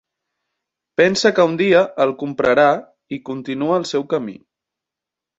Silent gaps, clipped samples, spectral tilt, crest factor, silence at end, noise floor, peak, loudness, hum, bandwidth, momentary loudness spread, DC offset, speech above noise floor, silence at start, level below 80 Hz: none; under 0.1%; -5 dB/octave; 18 dB; 1.05 s; -86 dBFS; -2 dBFS; -17 LUFS; none; 8 kHz; 13 LU; under 0.1%; 69 dB; 1 s; -60 dBFS